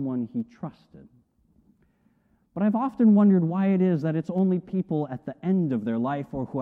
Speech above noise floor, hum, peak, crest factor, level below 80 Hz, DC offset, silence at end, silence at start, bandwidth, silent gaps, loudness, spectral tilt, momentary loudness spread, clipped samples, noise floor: 41 dB; none; -12 dBFS; 14 dB; -62 dBFS; under 0.1%; 0 s; 0 s; 4 kHz; none; -24 LUFS; -11 dB/octave; 14 LU; under 0.1%; -65 dBFS